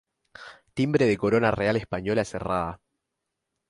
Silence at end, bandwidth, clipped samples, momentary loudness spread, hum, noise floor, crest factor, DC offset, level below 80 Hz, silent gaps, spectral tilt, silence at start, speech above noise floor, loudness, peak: 0.95 s; 11.5 kHz; under 0.1%; 19 LU; none; -83 dBFS; 20 dB; under 0.1%; -52 dBFS; none; -6.5 dB/octave; 0.4 s; 58 dB; -25 LUFS; -6 dBFS